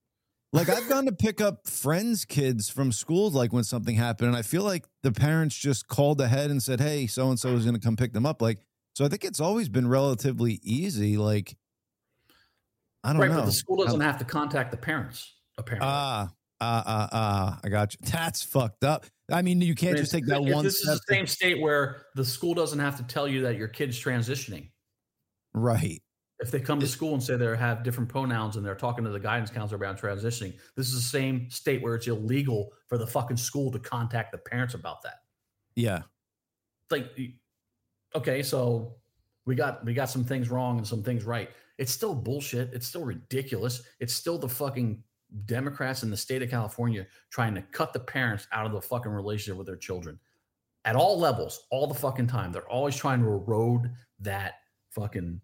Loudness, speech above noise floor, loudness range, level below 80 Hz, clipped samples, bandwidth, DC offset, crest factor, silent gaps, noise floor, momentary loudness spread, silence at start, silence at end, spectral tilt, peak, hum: -28 LUFS; 61 dB; 6 LU; -60 dBFS; under 0.1%; 17 kHz; under 0.1%; 20 dB; none; -88 dBFS; 10 LU; 0.5 s; 0.05 s; -5.5 dB/octave; -8 dBFS; none